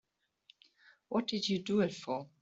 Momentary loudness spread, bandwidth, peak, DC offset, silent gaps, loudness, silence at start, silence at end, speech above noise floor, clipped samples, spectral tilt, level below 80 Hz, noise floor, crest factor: 7 LU; 7.8 kHz; -20 dBFS; under 0.1%; none; -35 LUFS; 1.1 s; 0.15 s; 34 dB; under 0.1%; -5.5 dB/octave; -76 dBFS; -68 dBFS; 18 dB